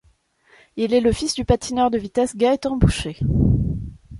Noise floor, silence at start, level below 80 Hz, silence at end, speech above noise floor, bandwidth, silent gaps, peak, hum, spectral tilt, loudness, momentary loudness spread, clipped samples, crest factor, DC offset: -59 dBFS; 0.75 s; -32 dBFS; 0 s; 40 dB; 11.5 kHz; none; -2 dBFS; none; -6.5 dB/octave; -20 LUFS; 7 LU; under 0.1%; 18 dB; under 0.1%